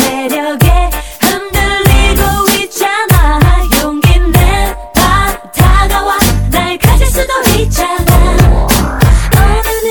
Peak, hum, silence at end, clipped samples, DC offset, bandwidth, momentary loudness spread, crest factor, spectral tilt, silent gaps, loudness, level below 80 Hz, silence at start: 0 dBFS; none; 0 s; 0.9%; 0.8%; 19 kHz; 4 LU; 8 dB; -4.5 dB/octave; none; -10 LUFS; -12 dBFS; 0 s